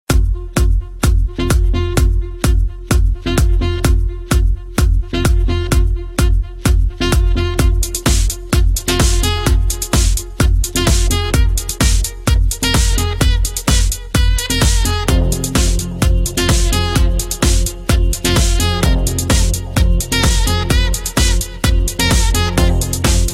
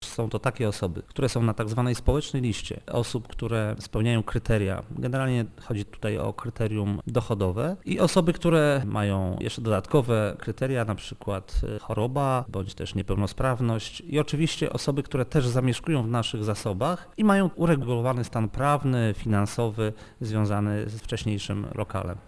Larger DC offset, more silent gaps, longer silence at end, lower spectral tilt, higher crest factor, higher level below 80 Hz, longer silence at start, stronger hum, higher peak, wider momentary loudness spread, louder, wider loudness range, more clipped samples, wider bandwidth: neither; neither; about the same, 0 s vs 0.05 s; second, -4 dB/octave vs -6.5 dB/octave; second, 12 dB vs 20 dB; first, -16 dBFS vs -40 dBFS; about the same, 0.1 s vs 0 s; neither; first, -2 dBFS vs -6 dBFS; second, 3 LU vs 9 LU; first, -16 LUFS vs -27 LUFS; about the same, 2 LU vs 4 LU; neither; first, 16 kHz vs 11 kHz